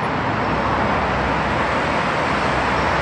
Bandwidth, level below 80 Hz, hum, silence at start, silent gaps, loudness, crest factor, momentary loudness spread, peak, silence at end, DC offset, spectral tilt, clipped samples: 10.5 kHz; -34 dBFS; none; 0 s; none; -19 LUFS; 12 dB; 1 LU; -6 dBFS; 0 s; under 0.1%; -5.5 dB/octave; under 0.1%